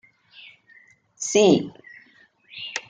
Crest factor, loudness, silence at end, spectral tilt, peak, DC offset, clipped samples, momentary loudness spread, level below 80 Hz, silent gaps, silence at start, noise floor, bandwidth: 20 dB; -20 LUFS; 0.1 s; -4 dB/octave; -4 dBFS; under 0.1%; under 0.1%; 20 LU; -66 dBFS; none; 1.2 s; -56 dBFS; 9.6 kHz